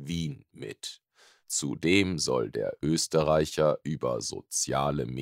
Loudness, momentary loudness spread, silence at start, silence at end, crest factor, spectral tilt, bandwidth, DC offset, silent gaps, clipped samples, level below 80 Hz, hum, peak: -28 LUFS; 14 LU; 0 s; 0 s; 20 dB; -4 dB/octave; 16 kHz; under 0.1%; none; under 0.1%; -54 dBFS; none; -8 dBFS